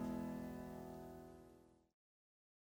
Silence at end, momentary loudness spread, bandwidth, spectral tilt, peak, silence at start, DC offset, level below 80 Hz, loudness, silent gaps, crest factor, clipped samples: 0.85 s; 18 LU; over 20 kHz; -7.5 dB/octave; -36 dBFS; 0 s; under 0.1%; -68 dBFS; -51 LUFS; none; 16 dB; under 0.1%